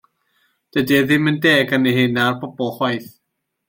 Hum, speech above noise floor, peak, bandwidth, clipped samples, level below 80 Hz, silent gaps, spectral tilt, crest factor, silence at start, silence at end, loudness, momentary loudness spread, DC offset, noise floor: none; 58 dB; -2 dBFS; 16.5 kHz; under 0.1%; -58 dBFS; none; -5.5 dB/octave; 16 dB; 0.75 s; 0.6 s; -17 LUFS; 10 LU; under 0.1%; -75 dBFS